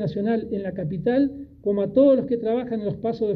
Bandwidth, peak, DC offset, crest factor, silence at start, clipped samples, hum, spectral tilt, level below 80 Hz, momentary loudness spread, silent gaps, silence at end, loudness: 5.4 kHz; -6 dBFS; under 0.1%; 16 dB; 0 s; under 0.1%; none; -10.5 dB/octave; -54 dBFS; 10 LU; none; 0 s; -23 LUFS